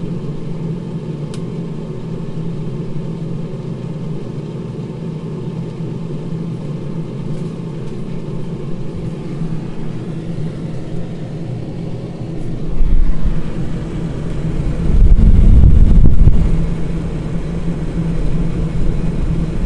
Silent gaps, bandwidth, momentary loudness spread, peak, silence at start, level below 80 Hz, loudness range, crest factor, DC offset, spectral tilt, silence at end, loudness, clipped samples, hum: none; 5.6 kHz; 13 LU; 0 dBFS; 0 s; -18 dBFS; 10 LU; 14 dB; under 0.1%; -9 dB/octave; 0 s; -20 LUFS; under 0.1%; none